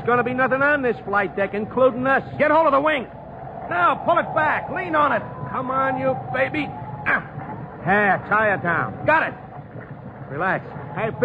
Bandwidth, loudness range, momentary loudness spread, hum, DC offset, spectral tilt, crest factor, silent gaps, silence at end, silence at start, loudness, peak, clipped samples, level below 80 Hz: 8 kHz; 3 LU; 16 LU; none; under 0.1%; -8 dB/octave; 14 dB; none; 0 s; 0 s; -21 LUFS; -6 dBFS; under 0.1%; -52 dBFS